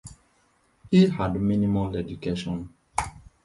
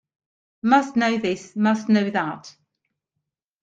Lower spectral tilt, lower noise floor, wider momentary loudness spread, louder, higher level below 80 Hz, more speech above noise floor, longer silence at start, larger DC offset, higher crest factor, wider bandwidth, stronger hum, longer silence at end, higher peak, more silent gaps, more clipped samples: first, -7 dB/octave vs -5.5 dB/octave; second, -65 dBFS vs -82 dBFS; first, 13 LU vs 9 LU; second, -25 LUFS vs -21 LUFS; first, -46 dBFS vs -68 dBFS; second, 42 dB vs 61 dB; second, 0.05 s vs 0.65 s; neither; about the same, 18 dB vs 20 dB; first, 11.5 kHz vs 7.8 kHz; neither; second, 0.25 s vs 1.15 s; second, -8 dBFS vs -4 dBFS; neither; neither